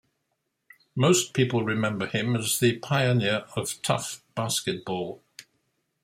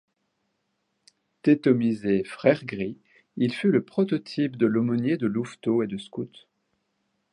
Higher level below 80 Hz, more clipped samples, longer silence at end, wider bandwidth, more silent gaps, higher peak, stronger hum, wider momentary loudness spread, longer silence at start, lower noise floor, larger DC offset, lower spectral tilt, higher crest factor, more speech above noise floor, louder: about the same, -64 dBFS vs -66 dBFS; neither; second, 0.6 s vs 1.05 s; first, 16 kHz vs 11 kHz; neither; second, -8 dBFS vs -4 dBFS; neither; about the same, 11 LU vs 12 LU; second, 0.95 s vs 1.45 s; about the same, -78 dBFS vs -76 dBFS; neither; second, -4.5 dB/octave vs -8 dB/octave; about the same, 20 dB vs 22 dB; about the same, 53 dB vs 52 dB; about the same, -26 LUFS vs -25 LUFS